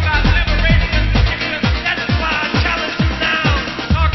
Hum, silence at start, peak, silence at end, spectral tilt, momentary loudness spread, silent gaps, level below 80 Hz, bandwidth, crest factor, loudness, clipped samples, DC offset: none; 0 s; -2 dBFS; 0 s; -6 dB/octave; 3 LU; none; -18 dBFS; 6.2 kHz; 14 dB; -16 LUFS; under 0.1%; under 0.1%